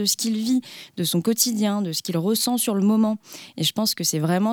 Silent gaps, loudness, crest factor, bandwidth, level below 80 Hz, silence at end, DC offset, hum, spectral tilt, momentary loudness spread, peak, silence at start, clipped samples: none; -22 LUFS; 18 dB; 20 kHz; -72 dBFS; 0 s; under 0.1%; none; -4 dB/octave; 5 LU; -4 dBFS; 0 s; under 0.1%